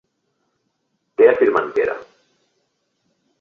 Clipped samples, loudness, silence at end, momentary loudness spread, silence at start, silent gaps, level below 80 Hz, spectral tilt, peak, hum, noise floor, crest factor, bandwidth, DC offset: under 0.1%; -16 LUFS; 1.35 s; 17 LU; 1.2 s; none; -62 dBFS; -6.5 dB/octave; -2 dBFS; none; -71 dBFS; 20 dB; 6.2 kHz; under 0.1%